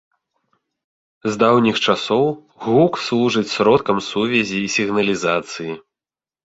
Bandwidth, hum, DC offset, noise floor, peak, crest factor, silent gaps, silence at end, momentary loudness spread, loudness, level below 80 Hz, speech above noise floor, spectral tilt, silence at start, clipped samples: 8 kHz; none; under 0.1%; under -90 dBFS; -2 dBFS; 18 dB; none; 0.8 s; 12 LU; -18 LUFS; -56 dBFS; over 72 dB; -5 dB/octave; 1.25 s; under 0.1%